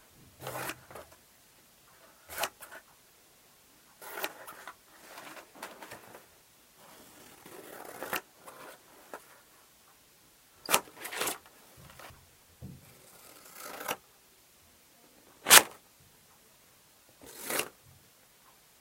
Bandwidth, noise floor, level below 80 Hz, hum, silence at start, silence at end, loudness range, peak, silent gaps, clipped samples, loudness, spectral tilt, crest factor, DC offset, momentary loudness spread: 16 kHz; -62 dBFS; -72 dBFS; none; 0.4 s; 1.1 s; 19 LU; 0 dBFS; none; under 0.1%; -28 LUFS; 0.5 dB/octave; 36 dB; under 0.1%; 23 LU